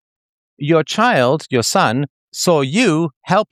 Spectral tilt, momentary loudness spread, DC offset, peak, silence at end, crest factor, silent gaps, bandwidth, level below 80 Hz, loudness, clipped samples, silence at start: -4.5 dB/octave; 7 LU; under 0.1%; -2 dBFS; 0.05 s; 16 dB; 2.10-2.32 s, 3.16-3.21 s; 15.5 kHz; -62 dBFS; -16 LUFS; under 0.1%; 0.6 s